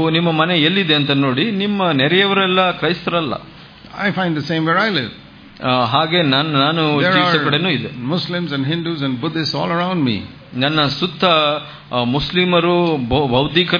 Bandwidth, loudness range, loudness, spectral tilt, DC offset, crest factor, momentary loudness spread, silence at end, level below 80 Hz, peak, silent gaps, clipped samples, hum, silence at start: 5.2 kHz; 4 LU; -16 LUFS; -7 dB/octave; under 0.1%; 16 dB; 8 LU; 0 s; -46 dBFS; 0 dBFS; none; under 0.1%; none; 0 s